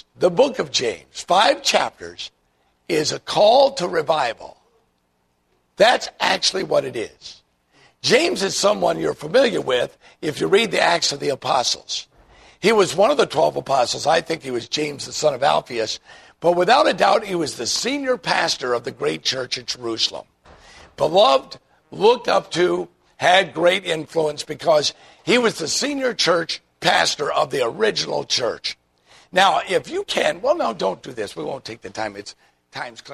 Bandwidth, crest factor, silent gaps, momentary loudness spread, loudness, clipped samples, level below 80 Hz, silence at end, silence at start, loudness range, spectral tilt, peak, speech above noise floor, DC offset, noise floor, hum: 13.5 kHz; 20 dB; none; 13 LU; -19 LUFS; under 0.1%; -58 dBFS; 0 s; 0.2 s; 3 LU; -3 dB/octave; -2 dBFS; 47 dB; under 0.1%; -67 dBFS; none